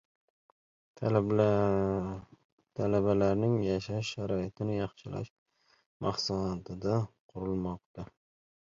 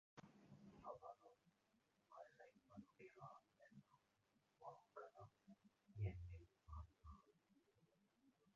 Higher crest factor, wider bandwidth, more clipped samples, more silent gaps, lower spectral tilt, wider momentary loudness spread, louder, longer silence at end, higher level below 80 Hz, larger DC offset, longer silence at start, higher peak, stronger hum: about the same, 20 dB vs 24 dB; about the same, 7.6 kHz vs 7.2 kHz; neither; first, 2.45-2.58 s, 5.30-5.46 s, 5.86-6.00 s, 7.20-7.29 s, 7.86-7.94 s vs none; about the same, -7 dB/octave vs -7.5 dB/octave; about the same, 15 LU vs 16 LU; first, -32 LUFS vs -61 LUFS; first, 0.6 s vs 0.05 s; first, -56 dBFS vs -70 dBFS; neither; first, 0.95 s vs 0.15 s; first, -12 dBFS vs -38 dBFS; neither